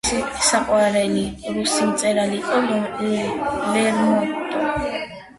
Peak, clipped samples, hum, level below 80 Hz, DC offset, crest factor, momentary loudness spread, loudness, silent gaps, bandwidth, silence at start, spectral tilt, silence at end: -6 dBFS; under 0.1%; none; -46 dBFS; under 0.1%; 16 dB; 6 LU; -20 LUFS; none; 11.5 kHz; 0.05 s; -3.5 dB/octave; 0.05 s